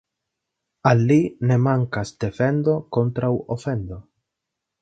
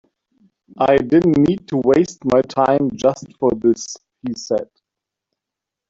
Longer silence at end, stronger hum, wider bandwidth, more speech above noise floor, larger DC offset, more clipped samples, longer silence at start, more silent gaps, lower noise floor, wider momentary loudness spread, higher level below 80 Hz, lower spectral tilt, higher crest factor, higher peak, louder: second, 0.8 s vs 1.25 s; neither; about the same, 8 kHz vs 7.8 kHz; second, 62 dB vs 68 dB; neither; neither; about the same, 0.85 s vs 0.75 s; neither; about the same, -83 dBFS vs -84 dBFS; second, 10 LU vs 14 LU; about the same, -50 dBFS vs -50 dBFS; first, -8 dB/octave vs -6.5 dB/octave; about the same, 20 dB vs 16 dB; about the same, -2 dBFS vs -2 dBFS; second, -21 LUFS vs -17 LUFS